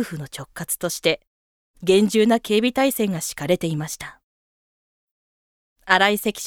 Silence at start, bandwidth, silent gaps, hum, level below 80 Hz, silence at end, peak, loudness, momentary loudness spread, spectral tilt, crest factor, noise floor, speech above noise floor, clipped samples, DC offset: 0 s; 19.5 kHz; 1.27-1.74 s, 4.23-5.76 s; none; -58 dBFS; 0 s; 0 dBFS; -21 LUFS; 15 LU; -4 dB/octave; 22 dB; under -90 dBFS; over 69 dB; under 0.1%; under 0.1%